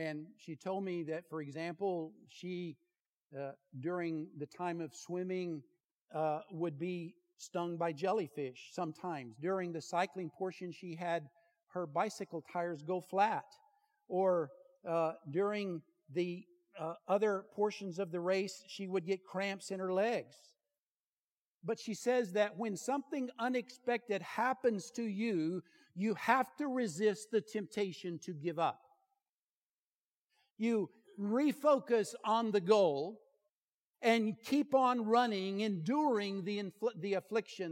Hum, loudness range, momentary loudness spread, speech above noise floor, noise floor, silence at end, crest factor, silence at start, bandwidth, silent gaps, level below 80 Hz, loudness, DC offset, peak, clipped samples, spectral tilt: none; 8 LU; 13 LU; over 54 dB; under -90 dBFS; 0 s; 24 dB; 0 s; 16.5 kHz; 3.00-3.30 s, 5.84-6.06 s, 11.63-11.67 s, 20.78-21.61 s, 29.29-30.30 s, 30.50-30.56 s, 33.49-33.94 s; under -90 dBFS; -37 LUFS; under 0.1%; -14 dBFS; under 0.1%; -5.5 dB/octave